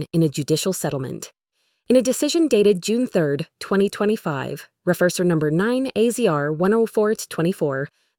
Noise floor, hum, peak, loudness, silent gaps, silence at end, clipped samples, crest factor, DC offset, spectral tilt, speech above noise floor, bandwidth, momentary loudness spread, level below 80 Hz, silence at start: -70 dBFS; none; -6 dBFS; -21 LUFS; none; 0.3 s; under 0.1%; 16 dB; under 0.1%; -5.5 dB/octave; 50 dB; 18.5 kHz; 10 LU; -60 dBFS; 0 s